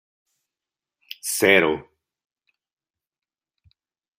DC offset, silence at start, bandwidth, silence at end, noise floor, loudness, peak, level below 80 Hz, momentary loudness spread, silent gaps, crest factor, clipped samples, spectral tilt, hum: under 0.1%; 1.25 s; 16 kHz; 2.4 s; under -90 dBFS; -20 LUFS; -2 dBFS; -66 dBFS; 17 LU; none; 26 dB; under 0.1%; -3 dB/octave; none